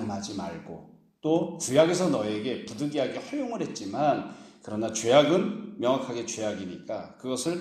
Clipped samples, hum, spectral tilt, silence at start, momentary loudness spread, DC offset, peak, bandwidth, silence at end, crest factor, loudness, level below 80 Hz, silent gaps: under 0.1%; none; -4.5 dB/octave; 0 s; 15 LU; under 0.1%; -6 dBFS; 14 kHz; 0 s; 22 dB; -28 LUFS; -68 dBFS; none